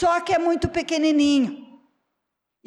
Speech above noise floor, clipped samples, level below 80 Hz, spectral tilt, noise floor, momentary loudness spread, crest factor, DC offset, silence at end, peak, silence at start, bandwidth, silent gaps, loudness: 60 dB; under 0.1%; -48 dBFS; -5 dB/octave; -81 dBFS; 7 LU; 10 dB; under 0.1%; 1 s; -12 dBFS; 0 s; 10.5 kHz; none; -21 LUFS